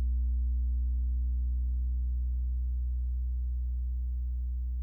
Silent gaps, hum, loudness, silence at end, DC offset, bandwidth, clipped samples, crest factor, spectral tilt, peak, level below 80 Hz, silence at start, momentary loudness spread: none; none; -34 LUFS; 0 s; under 0.1%; 0.3 kHz; under 0.1%; 6 dB; -11.5 dB/octave; -24 dBFS; -30 dBFS; 0 s; 3 LU